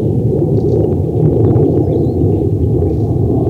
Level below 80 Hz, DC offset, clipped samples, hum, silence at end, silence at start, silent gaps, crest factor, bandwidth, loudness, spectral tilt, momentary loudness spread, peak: -26 dBFS; under 0.1%; under 0.1%; none; 0 s; 0 s; none; 12 dB; 4.3 kHz; -13 LUFS; -12 dB/octave; 3 LU; 0 dBFS